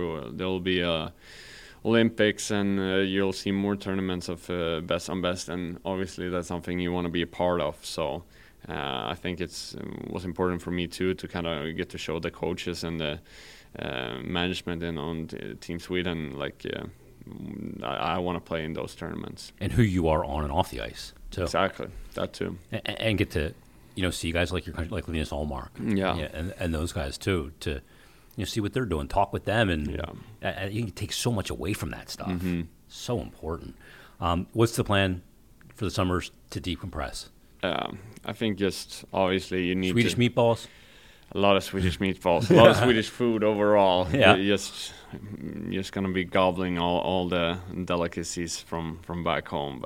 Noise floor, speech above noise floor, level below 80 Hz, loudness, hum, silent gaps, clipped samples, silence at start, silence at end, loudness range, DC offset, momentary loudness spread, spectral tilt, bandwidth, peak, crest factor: -54 dBFS; 26 dB; -46 dBFS; -28 LUFS; none; none; under 0.1%; 0 s; 0 s; 10 LU; under 0.1%; 14 LU; -5.5 dB/octave; 17 kHz; 0 dBFS; 28 dB